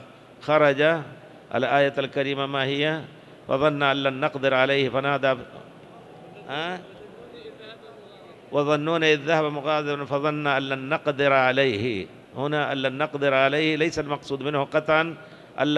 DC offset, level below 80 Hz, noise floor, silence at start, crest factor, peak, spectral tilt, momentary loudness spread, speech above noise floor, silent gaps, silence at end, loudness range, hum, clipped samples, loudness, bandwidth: under 0.1%; -62 dBFS; -46 dBFS; 0 s; 20 dB; -4 dBFS; -5.5 dB/octave; 21 LU; 23 dB; none; 0 s; 6 LU; none; under 0.1%; -23 LUFS; 11.5 kHz